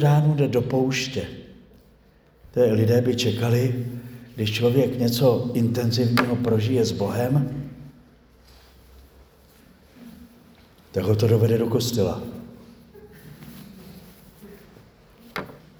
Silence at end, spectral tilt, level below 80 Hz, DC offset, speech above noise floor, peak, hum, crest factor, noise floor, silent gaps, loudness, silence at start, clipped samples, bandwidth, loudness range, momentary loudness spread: 0.25 s; -6.5 dB/octave; -54 dBFS; under 0.1%; 35 dB; -2 dBFS; none; 22 dB; -56 dBFS; none; -22 LUFS; 0 s; under 0.1%; over 20 kHz; 11 LU; 23 LU